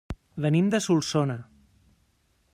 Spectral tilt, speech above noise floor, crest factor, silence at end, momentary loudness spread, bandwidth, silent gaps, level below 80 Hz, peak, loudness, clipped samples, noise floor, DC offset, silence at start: -6 dB/octave; 44 dB; 16 dB; 1.1 s; 13 LU; 14 kHz; none; -52 dBFS; -12 dBFS; -25 LUFS; under 0.1%; -68 dBFS; under 0.1%; 0.1 s